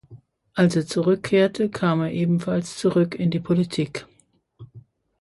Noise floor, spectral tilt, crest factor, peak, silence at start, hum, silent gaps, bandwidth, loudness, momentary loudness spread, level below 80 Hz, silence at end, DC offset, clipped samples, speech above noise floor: -62 dBFS; -6.5 dB/octave; 18 dB; -6 dBFS; 0.1 s; none; none; 11.5 kHz; -22 LUFS; 7 LU; -58 dBFS; 0.4 s; under 0.1%; under 0.1%; 41 dB